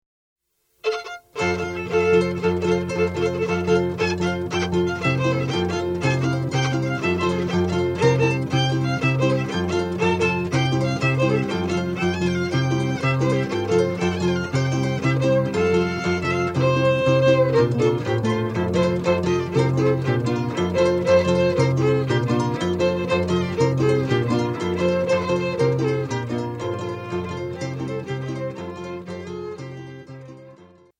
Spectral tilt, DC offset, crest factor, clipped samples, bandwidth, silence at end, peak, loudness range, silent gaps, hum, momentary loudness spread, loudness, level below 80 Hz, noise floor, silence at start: -6.5 dB/octave; under 0.1%; 16 dB; under 0.1%; 10 kHz; 0.35 s; -4 dBFS; 5 LU; none; none; 10 LU; -21 LUFS; -50 dBFS; -48 dBFS; 0.85 s